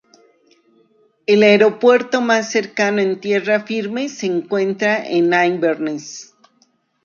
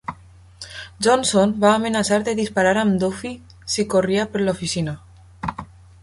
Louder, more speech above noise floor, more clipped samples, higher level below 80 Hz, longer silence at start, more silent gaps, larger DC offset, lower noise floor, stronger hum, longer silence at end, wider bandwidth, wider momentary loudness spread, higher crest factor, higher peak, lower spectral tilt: first, -16 LUFS vs -20 LUFS; first, 44 dB vs 27 dB; neither; second, -68 dBFS vs -48 dBFS; first, 1.3 s vs 0.1 s; neither; neither; first, -60 dBFS vs -46 dBFS; neither; first, 0.8 s vs 0.35 s; second, 7.4 kHz vs 11.5 kHz; second, 12 LU vs 18 LU; about the same, 16 dB vs 18 dB; about the same, -2 dBFS vs -4 dBFS; about the same, -4.5 dB/octave vs -4.5 dB/octave